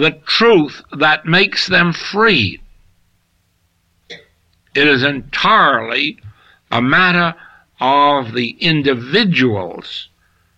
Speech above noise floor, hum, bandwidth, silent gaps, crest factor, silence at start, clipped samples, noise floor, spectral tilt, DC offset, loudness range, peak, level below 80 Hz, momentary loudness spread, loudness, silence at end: 47 dB; none; 8.8 kHz; none; 14 dB; 0 s; under 0.1%; -61 dBFS; -5.5 dB/octave; under 0.1%; 4 LU; -2 dBFS; -50 dBFS; 10 LU; -13 LUFS; 0.55 s